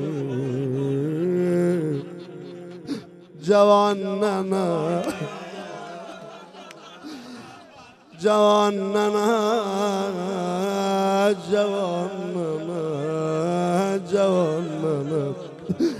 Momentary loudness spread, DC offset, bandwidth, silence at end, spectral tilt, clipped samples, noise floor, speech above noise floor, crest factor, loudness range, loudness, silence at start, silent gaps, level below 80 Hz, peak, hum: 19 LU; under 0.1%; 14 kHz; 0 s; -6 dB/octave; under 0.1%; -48 dBFS; 26 dB; 18 dB; 6 LU; -23 LUFS; 0 s; none; -68 dBFS; -6 dBFS; none